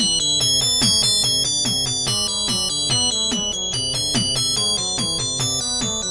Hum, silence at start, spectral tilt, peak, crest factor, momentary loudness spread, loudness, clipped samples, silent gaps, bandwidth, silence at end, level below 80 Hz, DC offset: none; 0 s; -1.5 dB/octave; -4 dBFS; 16 dB; 6 LU; -17 LUFS; under 0.1%; none; 11.5 kHz; 0 s; -44 dBFS; under 0.1%